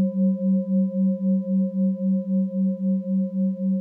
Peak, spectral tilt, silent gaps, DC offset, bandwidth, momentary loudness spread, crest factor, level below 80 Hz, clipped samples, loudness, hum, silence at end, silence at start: -14 dBFS; -14.5 dB/octave; none; under 0.1%; 1.1 kHz; 3 LU; 8 dB; -78 dBFS; under 0.1%; -23 LUFS; none; 0 s; 0 s